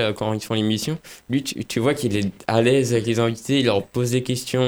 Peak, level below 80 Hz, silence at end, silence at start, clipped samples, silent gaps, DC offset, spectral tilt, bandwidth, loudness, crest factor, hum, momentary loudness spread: -4 dBFS; -54 dBFS; 0 s; 0 s; under 0.1%; none; under 0.1%; -5.5 dB/octave; over 20 kHz; -22 LUFS; 18 dB; none; 8 LU